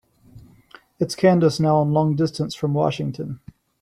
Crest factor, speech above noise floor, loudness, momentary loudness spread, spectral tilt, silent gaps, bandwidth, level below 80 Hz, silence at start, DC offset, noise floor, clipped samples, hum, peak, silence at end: 18 dB; 30 dB; -20 LUFS; 13 LU; -7 dB/octave; none; 13 kHz; -56 dBFS; 0.35 s; under 0.1%; -50 dBFS; under 0.1%; none; -4 dBFS; 0.45 s